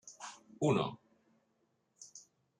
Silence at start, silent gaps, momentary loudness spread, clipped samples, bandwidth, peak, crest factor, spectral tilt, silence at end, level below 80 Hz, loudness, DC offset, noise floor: 0.05 s; none; 24 LU; under 0.1%; 10.5 kHz; -20 dBFS; 22 dB; -6 dB/octave; 0.4 s; -78 dBFS; -35 LUFS; under 0.1%; -78 dBFS